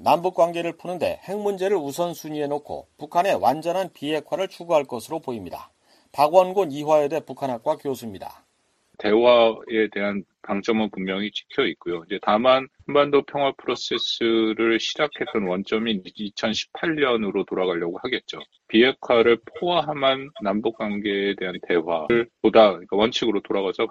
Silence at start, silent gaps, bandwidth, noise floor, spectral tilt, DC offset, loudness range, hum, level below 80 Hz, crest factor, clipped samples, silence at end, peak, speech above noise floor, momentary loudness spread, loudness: 0 s; none; 14 kHz; -65 dBFS; -5 dB/octave; under 0.1%; 3 LU; none; -60 dBFS; 20 dB; under 0.1%; 0 s; -2 dBFS; 43 dB; 11 LU; -23 LUFS